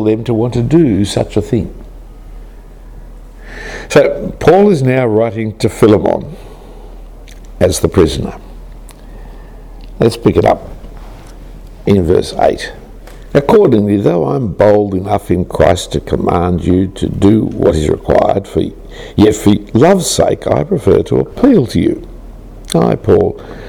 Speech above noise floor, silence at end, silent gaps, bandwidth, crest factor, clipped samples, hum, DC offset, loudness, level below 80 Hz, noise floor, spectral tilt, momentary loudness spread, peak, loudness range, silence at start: 21 dB; 0 s; none; 17.5 kHz; 12 dB; under 0.1%; none; under 0.1%; -12 LUFS; -30 dBFS; -32 dBFS; -6.5 dB/octave; 12 LU; 0 dBFS; 6 LU; 0 s